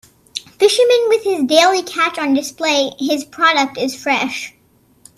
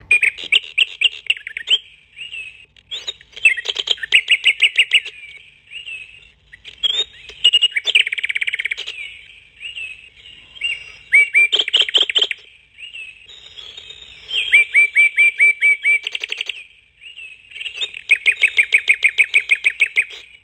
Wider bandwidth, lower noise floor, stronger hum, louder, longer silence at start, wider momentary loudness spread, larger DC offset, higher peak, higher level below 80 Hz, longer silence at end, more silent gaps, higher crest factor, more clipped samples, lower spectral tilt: about the same, 14.5 kHz vs 15 kHz; first, -54 dBFS vs -46 dBFS; neither; about the same, -15 LUFS vs -14 LUFS; first, 0.35 s vs 0.1 s; second, 13 LU vs 22 LU; neither; about the same, 0 dBFS vs 0 dBFS; about the same, -62 dBFS vs -60 dBFS; first, 0.7 s vs 0.2 s; neither; about the same, 16 dB vs 18 dB; neither; first, -2 dB/octave vs 2.5 dB/octave